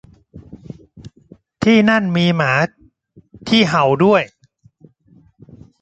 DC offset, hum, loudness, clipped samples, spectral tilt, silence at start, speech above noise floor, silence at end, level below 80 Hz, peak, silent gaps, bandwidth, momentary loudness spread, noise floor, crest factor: under 0.1%; none; -15 LUFS; under 0.1%; -6 dB/octave; 0.35 s; 38 dB; 1.55 s; -52 dBFS; 0 dBFS; none; 8.2 kHz; 24 LU; -52 dBFS; 18 dB